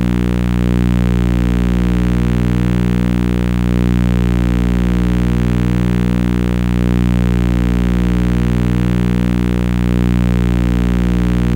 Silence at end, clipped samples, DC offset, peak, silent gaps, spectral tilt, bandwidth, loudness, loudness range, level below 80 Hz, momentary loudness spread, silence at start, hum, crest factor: 0 s; under 0.1%; under 0.1%; -2 dBFS; none; -8 dB/octave; 16.5 kHz; -15 LUFS; 0 LU; -18 dBFS; 1 LU; 0 s; 60 Hz at -15 dBFS; 12 dB